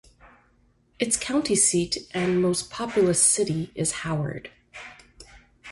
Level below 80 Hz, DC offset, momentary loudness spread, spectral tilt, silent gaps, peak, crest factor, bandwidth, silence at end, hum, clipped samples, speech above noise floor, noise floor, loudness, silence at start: -54 dBFS; under 0.1%; 23 LU; -3.5 dB/octave; none; -8 dBFS; 20 dB; 12 kHz; 0 s; none; under 0.1%; 39 dB; -63 dBFS; -23 LUFS; 0.25 s